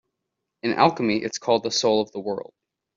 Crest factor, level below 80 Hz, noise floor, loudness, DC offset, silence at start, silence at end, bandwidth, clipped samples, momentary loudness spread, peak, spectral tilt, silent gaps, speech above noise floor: 22 dB; -66 dBFS; -82 dBFS; -23 LUFS; under 0.1%; 0.65 s; 0.55 s; 7.8 kHz; under 0.1%; 11 LU; -2 dBFS; -4 dB/octave; none; 59 dB